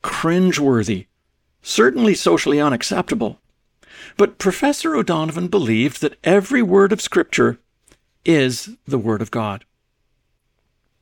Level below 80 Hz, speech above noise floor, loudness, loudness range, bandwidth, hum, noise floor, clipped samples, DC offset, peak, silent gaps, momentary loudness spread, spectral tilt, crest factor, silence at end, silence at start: -54 dBFS; 51 dB; -18 LUFS; 4 LU; 18 kHz; none; -68 dBFS; under 0.1%; under 0.1%; -2 dBFS; none; 10 LU; -5 dB/octave; 18 dB; 1.45 s; 0.05 s